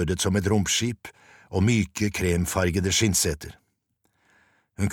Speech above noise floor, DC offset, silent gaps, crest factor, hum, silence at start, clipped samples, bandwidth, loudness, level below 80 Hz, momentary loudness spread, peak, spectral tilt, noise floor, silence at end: 49 dB; under 0.1%; none; 18 dB; none; 0 s; under 0.1%; 17.5 kHz; -24 LUFS; -44 dBFS; 13 LU; -8 dBFS; -4 dB/octave; -73 dBFS; 0 s